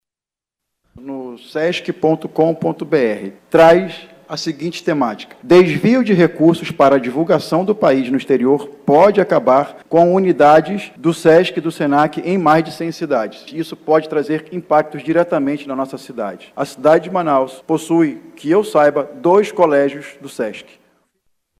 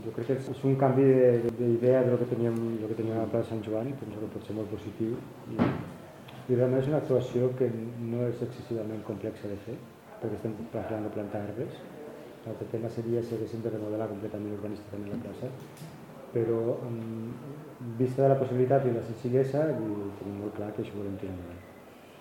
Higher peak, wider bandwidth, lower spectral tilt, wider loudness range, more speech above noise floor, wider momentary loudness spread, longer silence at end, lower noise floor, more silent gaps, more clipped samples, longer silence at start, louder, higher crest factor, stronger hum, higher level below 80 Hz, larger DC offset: first, -2 dBFS vs -10 dBFS; second, 14.5 kHz vs 16.5 kHz; second, -6.5 dB/octave vs -9 dB/octave; second, 5 LU vs 10 LU; first, 74 dB vs 21 dB; second, 15 LU vs 18 LU; first, 1 s vs 0 s; first, -89 dBFS vs -50 dBFS; neither; neither; first, 1 s vs 0 s; first, -15 LUFS vs -30 LUFS; second, 14 dB vs 20 dB; neither; first, -56 dBFS vs -66 dBFS; neither